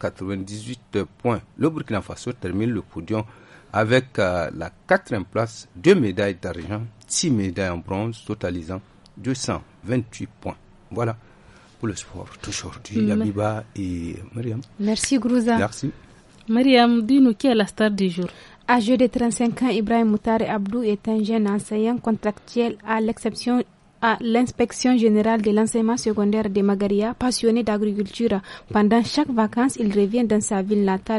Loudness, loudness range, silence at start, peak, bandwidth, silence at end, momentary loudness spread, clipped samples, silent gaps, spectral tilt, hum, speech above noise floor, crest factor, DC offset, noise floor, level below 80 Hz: -22 LUFS; 8 LU; 0 s; -2 dBFS; 11.5 kHz; 0 s; 13 LU; under 0.1%; none; -5.5 dB/octave; none; 28 dB; 20 dB; under 0.1%; -50 dBFS; -50 dBFS